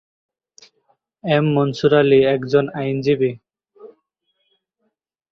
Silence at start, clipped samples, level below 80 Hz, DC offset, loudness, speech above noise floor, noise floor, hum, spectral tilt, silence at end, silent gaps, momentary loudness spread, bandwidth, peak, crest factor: 1.25 s; under 0.1%; -60 dBFS; under 0.1%; -17 LUFS; 56 dB; -73 dBFS; none; -7.5 dB/octave; 1.45 s; none; 9 LU; 7 kHz; -2 dBFS; 18 dB